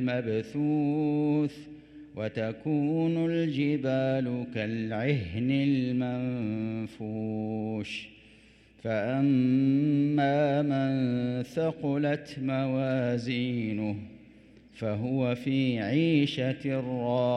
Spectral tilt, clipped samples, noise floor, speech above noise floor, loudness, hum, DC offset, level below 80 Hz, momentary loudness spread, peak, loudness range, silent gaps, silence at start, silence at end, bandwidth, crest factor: -8 dB/octave; under 0.1%; -57 dBFS; 29 dB; -29 LUFS; none; under 0.1%; -64 dBFS; 10 LU; -14 dBFS; 4 LU; none; 0 s; 0 s; 8.8 kHz; 14 dB